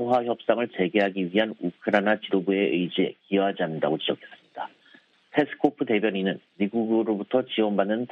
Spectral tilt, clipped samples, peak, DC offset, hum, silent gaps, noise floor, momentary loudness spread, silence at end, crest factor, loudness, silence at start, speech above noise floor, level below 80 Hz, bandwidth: -8 dB/octave; under 0.1%; -4 dBFS; under 0.1%; none; none; -57 dBFS; 6 LU; 0.05 s; 20 dB; -25 LUFS; 0 s; 32 dB; -72 dBFS; 6.8 kHz